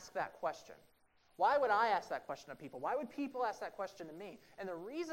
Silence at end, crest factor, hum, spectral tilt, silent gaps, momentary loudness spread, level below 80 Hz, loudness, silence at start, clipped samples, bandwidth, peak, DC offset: 0 s; 18 dB; none; -4 dB/octave; none; 18 LU; -78 dBFS; -38 LUFS; 0 s; under 0.1%; 16 kHz; -20 dBFS; under 0.1%